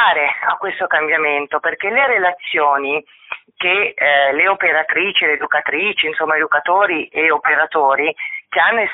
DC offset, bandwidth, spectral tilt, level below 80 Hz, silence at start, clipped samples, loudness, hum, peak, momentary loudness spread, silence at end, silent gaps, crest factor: under 0.1%; 4.1 kHz; 1.5 dB/octave; -64 dBFS; 0 s; under 0.1%; -15 LUFS; none; -2 dBFS; 7 LU; 0 s; none; 14 dB